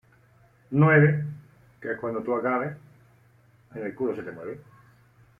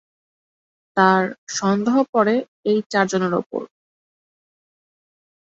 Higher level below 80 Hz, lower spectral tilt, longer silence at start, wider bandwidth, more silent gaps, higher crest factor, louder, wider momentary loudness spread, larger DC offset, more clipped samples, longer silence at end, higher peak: about the same, -66 dBFS vs -66 dBFS; first, -10.5 dB/octave vs -5 dB/octave; second, 0.7 s vs 0.95 s; second, 3.3 kHz vs 8 kHz; second, none vs 1.38-1.47 s, 2.09-2.13 s, 2.48-2.63 s, 2.86-2.90 s, 3.46-3.50 s; about the same, 20 dB vs 20 dB; second, -25 LUFS vs -20 LUFS; first, 23 LU vs 9 LU; neither; neither; second, 0.85 s vs 1.85 s; second, -8 dBFS vs -2 dBFS